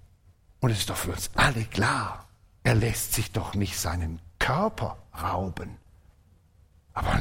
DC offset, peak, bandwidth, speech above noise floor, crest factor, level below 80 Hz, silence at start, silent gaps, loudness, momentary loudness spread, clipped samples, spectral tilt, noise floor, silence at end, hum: under 0.1%; -8 dBFS; 16.5 kHz; 32 dB; 20 dB; -42 dBFS; 0.6 s; none; -28 LUFS; 12 LU; under 0.1%; -4.5 dB/octave; -59 dBFS; 0 s; none